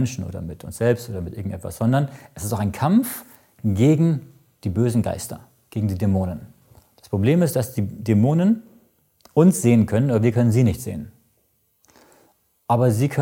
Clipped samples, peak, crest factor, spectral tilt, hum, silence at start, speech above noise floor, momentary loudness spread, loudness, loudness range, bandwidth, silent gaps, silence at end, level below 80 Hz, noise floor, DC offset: under 0.1%; -2 dBFS; 18 dB; -7.5 dB/octave; none; 0 s; 46 dB; 15 LU; -21 LUFS; 4 LU; 17 kHz; none; 0 s; -50 dBFS; -66 dBFS; under 0.1%